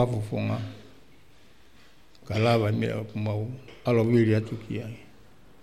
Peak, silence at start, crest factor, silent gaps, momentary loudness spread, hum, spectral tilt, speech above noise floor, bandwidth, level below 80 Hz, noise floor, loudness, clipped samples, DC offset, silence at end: -10 dBFS; 0 s; 18 dB; none; 16 LU; none; -8 dB/octave; 32 dB; 12.5 kHz; -58 dBFS; -58 dBFS; -27 LUFS; under 0.1%; 0.3%; 0.6 s